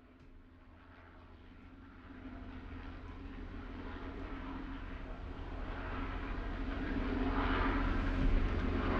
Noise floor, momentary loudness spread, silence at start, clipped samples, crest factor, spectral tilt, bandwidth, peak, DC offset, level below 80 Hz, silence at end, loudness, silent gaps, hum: -58 dBFS; 22 LU; 0 s; under 0.1%; 18 dB; -8 dB/octave; 6.2 kHz; -20 dBFS; under 0.1%; -40 dBFS; 0 s; -40 LUFS; none; none